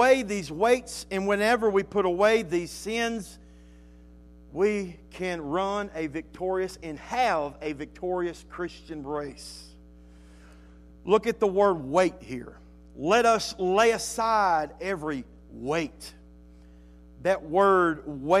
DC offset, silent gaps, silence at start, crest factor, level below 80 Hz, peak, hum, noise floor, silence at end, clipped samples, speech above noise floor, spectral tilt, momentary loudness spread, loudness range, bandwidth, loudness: under 0.1%; none; 0 s; 20 dB; -52 dBFS; -8 dBFS; none; -50 dBFS; 0 s; under 0.1%; 24 dB; -4.5 dB/octave; 17 LU; 7 LU; 14.5 kHz; -26 LUFS